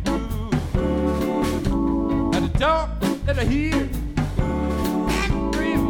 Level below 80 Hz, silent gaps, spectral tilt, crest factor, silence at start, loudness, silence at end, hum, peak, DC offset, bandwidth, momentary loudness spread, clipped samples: -28 dBFS; none; -6.5 dB/octave; 14 dB; 0 s; -23 LUFS; 0 s; none; -8 dBFS; 0.2%; 17.5 kHz; 4 LU; under 0.1%